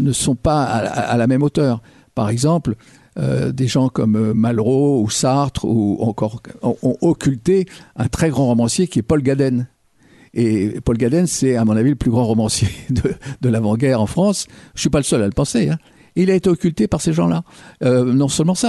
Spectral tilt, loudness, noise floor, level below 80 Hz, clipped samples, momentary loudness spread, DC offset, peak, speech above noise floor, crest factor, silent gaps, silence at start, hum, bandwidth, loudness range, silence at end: -6 dB/octave; -17 LUFS; -51 dBFS; -40 dBFS; under 0.1%; 8 LU; under 0.1%; -4 dBFS; 34 dB; 12 dB; none; 0 s; none; 12 kHz; 1 LU; 0 s